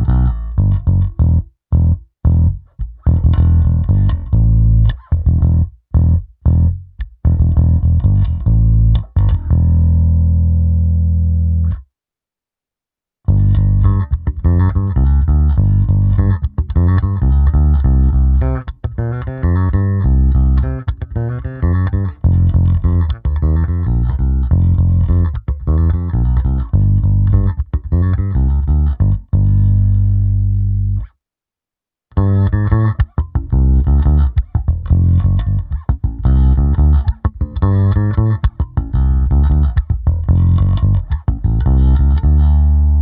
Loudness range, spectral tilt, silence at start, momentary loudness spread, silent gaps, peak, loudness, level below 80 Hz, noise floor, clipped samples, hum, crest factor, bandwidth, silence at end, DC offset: 3 LU; -13 dB/octave; 0 s; 7 LU; none; 0 dBFS; -15 LUFS; -16 dBFS; -88 dBFS; under 0.1%; none; 12 dB; 3.7 kHz; 0 s; under 0.1%